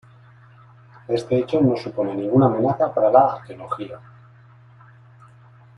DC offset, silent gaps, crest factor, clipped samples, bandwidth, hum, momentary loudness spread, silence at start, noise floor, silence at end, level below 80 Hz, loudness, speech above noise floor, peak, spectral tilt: under 0.1%; none; 20 dB; under 0.1%; 10.5 kHz; none; 15 LU; 1.1 s; -49 dBFS; 1.8 s; -60 dBFS; -20 LUFS; 29 dB; -2 dBFS; -9 dB/octave